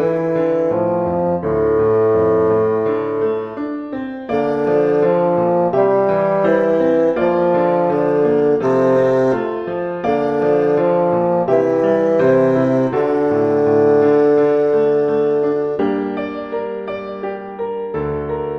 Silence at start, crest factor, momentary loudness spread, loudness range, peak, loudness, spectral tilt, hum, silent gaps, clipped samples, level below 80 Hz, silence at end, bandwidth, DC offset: 0 s; 12 dB; 10 LU; 3 LU; -2 dBFS; -16 LUFS; -9 dB/octave; none; none; under 0.1%; -48 dBFS; 0 s; 6.4 kHz; under 0.1%